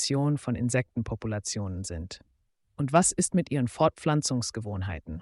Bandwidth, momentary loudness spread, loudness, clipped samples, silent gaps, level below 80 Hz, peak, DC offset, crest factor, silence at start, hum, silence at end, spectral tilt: 11.5 kHz; 12 LU; -28 LUFS; under 0.1%; none; -50 dBFS; -8 dBFS; under 0.1%; 20 dB; 0 s; none; 0 s; -5 dB/octave